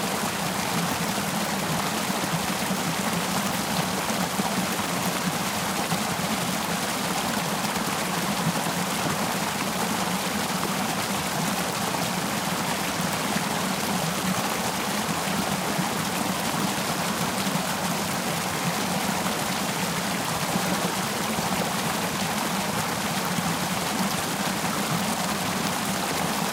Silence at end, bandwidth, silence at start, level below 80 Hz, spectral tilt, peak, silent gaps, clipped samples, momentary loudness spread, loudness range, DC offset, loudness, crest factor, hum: 0 s; 16 kHz; 0 s; -56 dBFS; -3 dB/octave; -10 dBFS; none; under 0.1%; 1 LU; 0 LU; under 0.1%; -26 LUFS; 16 dB; none